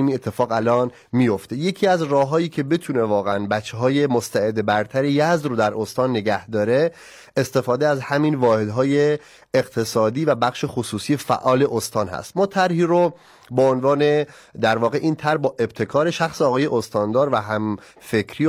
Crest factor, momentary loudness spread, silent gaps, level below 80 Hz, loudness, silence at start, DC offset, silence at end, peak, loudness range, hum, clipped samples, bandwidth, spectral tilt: 16 dB; 6 LU; none; -56 dBFS; -20 LUFS; 0 s; under 0.1%; 0 s; -4 dBFS; 1 LU; none; under 0.1%; 16 kHz; -6 dB/octave